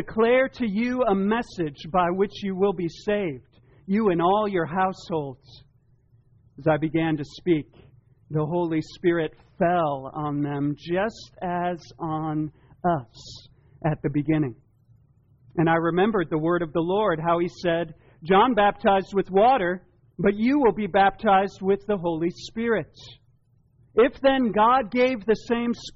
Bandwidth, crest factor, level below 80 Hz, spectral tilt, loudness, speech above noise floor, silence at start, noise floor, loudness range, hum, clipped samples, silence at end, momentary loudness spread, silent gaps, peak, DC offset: 7.4 kHz; 16 dB; -52 dBFS; -5 dB/octave; -24 LUFS; 38 dB; 0 s; -61 dBFS; 7 LU; none; under 0.1%; 0.05 s; 10 LU; none; -8 dBFS; under 0.1%